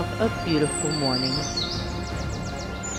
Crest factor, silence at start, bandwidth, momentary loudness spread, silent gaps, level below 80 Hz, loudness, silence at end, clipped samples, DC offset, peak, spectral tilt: 16 dB; 0 s; 16 kHz; 8 LU; none; -38 dBFS; -26 LUFS; 0 s; under 0.1%; under 0.1%; -10 dBFS; -4 dB/octave